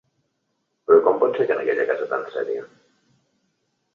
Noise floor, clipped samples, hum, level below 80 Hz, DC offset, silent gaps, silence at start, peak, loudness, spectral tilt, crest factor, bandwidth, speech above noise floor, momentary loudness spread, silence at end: -74 dBFS; under 0.1%; none; -72 dBFS; under 0.1%; none; 0.9 s; -4 dBFS; -21 LUFS; -7 dB/octave; 20 dB; 5.2 kHz; 52 dB; 13 LU; 1.3 s